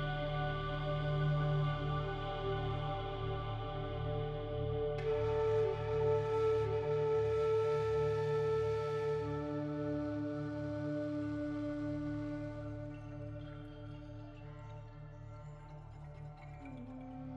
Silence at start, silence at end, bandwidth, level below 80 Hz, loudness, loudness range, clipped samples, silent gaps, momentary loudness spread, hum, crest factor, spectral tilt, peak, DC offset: 0 s; 0 s; 7.8 kHz; -50 dBFS; -37 LUFS; 15 LU; under 0.1%; none; 17 LU; none; 14 dB; -8 dB/octave; -24 dBFS; under 0.1%